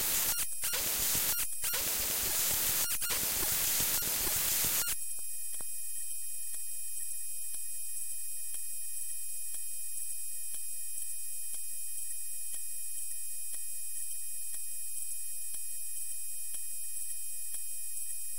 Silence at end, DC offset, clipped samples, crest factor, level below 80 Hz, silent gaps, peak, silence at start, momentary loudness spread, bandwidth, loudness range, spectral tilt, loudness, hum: 0 s; 2%; under 0.1%; 20 dB; -60 dBFS; none; -16 dBFS; 0 s; 9 LU; 16.5 kHz; 8 LU; 0.5 dB/octave; -33 LUFS; none